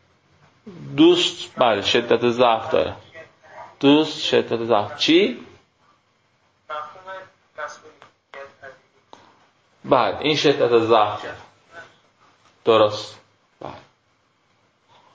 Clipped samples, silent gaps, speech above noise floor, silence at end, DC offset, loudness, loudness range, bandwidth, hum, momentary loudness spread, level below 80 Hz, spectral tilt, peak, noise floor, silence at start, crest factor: under 0.1%; none; 46 dB; 1.35 s; under 0.1%; -19 LUFS; 18 LU; 8 kHz; none; 22 LU; -60 dBFS; -4.5 dB/octave; -2 dBFS; -64 dBFS; 0.65 s; 20 dB